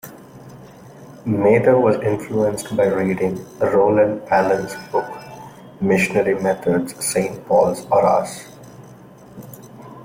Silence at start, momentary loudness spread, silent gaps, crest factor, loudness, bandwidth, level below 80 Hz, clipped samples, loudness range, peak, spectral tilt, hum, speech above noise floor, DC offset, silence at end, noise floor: 0.05 s; 23 LU; none; 16 dB; -18 LUFS; 16.5 kHz; -54 dBFS; under 0.1%; 3 LU; -4 dBFS; -6 dB/octave; none; 25 dB; under 0.1%; 0 s; -42 dBFS